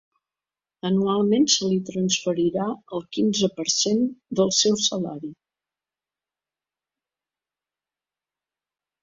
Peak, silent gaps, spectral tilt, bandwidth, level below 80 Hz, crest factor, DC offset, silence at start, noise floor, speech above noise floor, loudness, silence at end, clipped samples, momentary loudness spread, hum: -6 dBFS; none; -4 dB/octave; 7.8 kHz; -66 dBFS; 20 dB; under 0.1%; 0.85 s; under -90 dBFS; over 67 dB; -22 LUFS; 3.7 s; under 0.1%; 12 LU; 50 Hz at -60 dBFS